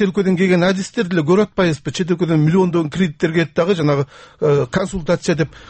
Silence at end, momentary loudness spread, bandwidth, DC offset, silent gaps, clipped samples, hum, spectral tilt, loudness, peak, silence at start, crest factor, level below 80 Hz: 0.1 s; 6 LU; 8.8 kHz; under 0.1%; none; under 0.1%; none; -6.5 dB/octave; -17 LUFS; -4 dBFS; 0 s; 12 dB; -44 dBFS